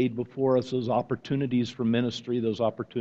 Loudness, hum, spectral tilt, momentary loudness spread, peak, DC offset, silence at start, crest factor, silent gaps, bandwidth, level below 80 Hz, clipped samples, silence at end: -28 LUFS; none; -7.5 dB/octave; 4 LU; -12 dBFS; under 0.1%; 0 s; 14 dB; none; 7.8 kHz; -64 dBFS; under 0.1%; 0 s